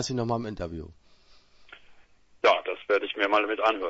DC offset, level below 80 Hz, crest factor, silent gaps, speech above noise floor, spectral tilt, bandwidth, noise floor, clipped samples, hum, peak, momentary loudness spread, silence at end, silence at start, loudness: under 0.1%; -54 dBFS; 22 dB; none; 28 dB; -4.5 dB/octave; 8 kHz; -56 dBFS; under 0.1%; none; -6 dBFS; 14 LU; 0 s; 0 s; -26 LUFS